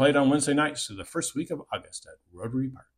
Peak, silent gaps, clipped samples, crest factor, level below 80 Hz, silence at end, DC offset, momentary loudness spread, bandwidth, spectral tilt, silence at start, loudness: -10 dBFS; none; under 0.1%; 18 dB; -62 dBFS; 0.2 s; under 0.1%; 15 LU; 15 kHz; -4.5 dB/octave; 0 s; -28 LUFS